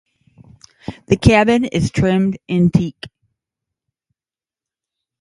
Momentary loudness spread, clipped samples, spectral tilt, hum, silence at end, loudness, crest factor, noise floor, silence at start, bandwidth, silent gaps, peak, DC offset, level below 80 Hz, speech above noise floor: 22 LU; under 0.1%; -7 dB/octave; none; 2.15 s; -16 LUFS; 18 dB; under -90 dBFS; 0.9 s; 11.5 kHz; none; 0 dBFS; under 0.1%; -38 dBFS; over 75 dB